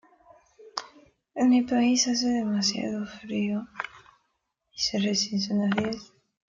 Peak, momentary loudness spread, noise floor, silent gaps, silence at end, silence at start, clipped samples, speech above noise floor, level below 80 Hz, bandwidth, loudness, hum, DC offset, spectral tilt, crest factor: -6 dBFS; 15 LU; -77 dBFS; none; 0.5 s; 0.6 s; under 0.1%; 52 dB; -64 dBFS; 7.6 kHz; -26 LUFS; none; under 0.1%; -3.5 dB/octave; 22 dB